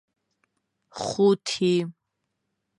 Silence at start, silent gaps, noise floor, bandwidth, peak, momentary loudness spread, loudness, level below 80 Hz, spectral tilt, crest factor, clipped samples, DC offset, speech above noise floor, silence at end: 0.95 s; none; -79 dBFS; 11 kHz; -8 dBFS; 15 LU; -24 LUFS; -70 dBFS; -5.5 dB/octave; 18 dB; under 0.1%; under 0.1%; 56 dB; 0.9 s